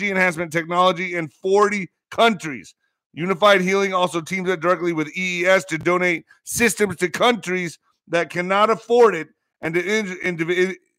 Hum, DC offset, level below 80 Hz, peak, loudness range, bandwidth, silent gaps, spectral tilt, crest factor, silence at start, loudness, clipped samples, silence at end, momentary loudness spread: none; under 0.1%; -60 dBFS; -2 dBFS; 1 LU; 16 kHz; 3.06-3.10 s; -4 dB/octave; 18 dB; 0 s; -20 LUFS; under 0.1%; 0.25 s; 11 LU